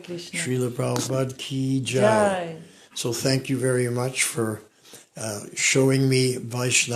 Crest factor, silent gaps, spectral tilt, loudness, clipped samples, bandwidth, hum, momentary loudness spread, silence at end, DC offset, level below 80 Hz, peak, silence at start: 20 dB; none; -4 dB/octave; -23 LUFS; under 0.1%; 15 kHz; none; 13 LU; 0 s; under 0.1%; -62 dBFS; -4 dBFS; 0 s